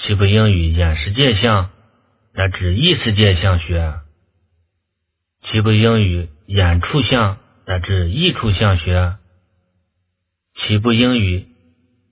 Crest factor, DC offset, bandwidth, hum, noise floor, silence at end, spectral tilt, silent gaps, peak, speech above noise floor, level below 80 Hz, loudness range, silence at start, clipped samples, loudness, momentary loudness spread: 16 dB; under 0.1%; 4 kHz; none; -75 dBFS; 0.7 s; -10.5 dB/octave; none; 0 dBFS; 60 dB; -26 dBFS; 4 LU; 0 s; under 0.1%; -16 LUFS; 12 LU